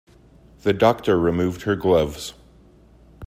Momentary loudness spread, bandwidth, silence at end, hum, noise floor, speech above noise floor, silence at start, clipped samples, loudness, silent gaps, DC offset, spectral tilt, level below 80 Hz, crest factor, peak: 10 LU; 16 kHz; 0 s; none; -51 dBFS; 31 dB; 0.65 s; under 0.1%; -20 LUFS; none; under 0.1%; -6.5 dB/octave; -46 dBFS; 20 dB; -4 dBFS